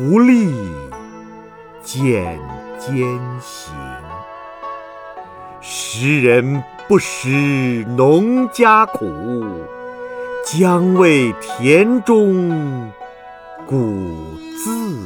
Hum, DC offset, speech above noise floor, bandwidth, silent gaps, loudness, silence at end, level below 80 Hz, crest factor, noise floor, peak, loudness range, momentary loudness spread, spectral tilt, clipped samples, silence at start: none; under 0.1%; 23 dB; 19.5 kHz; none; -15 LUFS; 0 s; -48 dBFS; 16 dB; -38 dBFS; 0 dBFS; 9 LU; 22 LU; -6 dB/octave; under 0.1%; 0 s